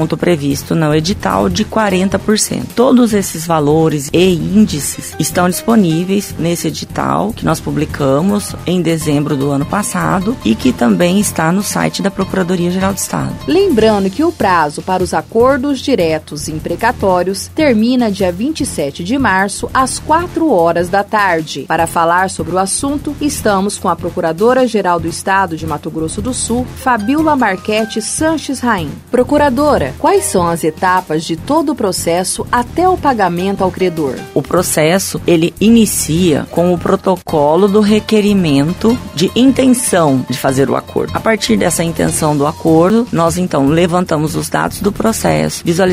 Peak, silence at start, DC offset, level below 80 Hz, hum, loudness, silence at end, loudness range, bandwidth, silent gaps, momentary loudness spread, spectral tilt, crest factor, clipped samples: 0 dBFS; 0 s; under 0.1%; -36 dBFS; none; -13 LUFS; 0 s; 3 LU; 16 kHz; none; 6 LU; -5 dB/octave; 12 dB; under 0.1%